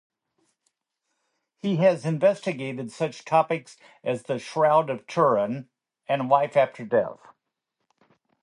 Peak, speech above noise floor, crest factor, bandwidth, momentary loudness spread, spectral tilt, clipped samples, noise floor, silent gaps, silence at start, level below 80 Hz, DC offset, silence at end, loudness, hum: -6 dBFS; 57 dB; 20 dB; 11 kHz; 11 LU; -6.5 dB/octave; under 0.1%; -81 dBFS; none; 1.65 s; -74 dBFS; under 0.1%; 1.3 s; -24 LUFS; none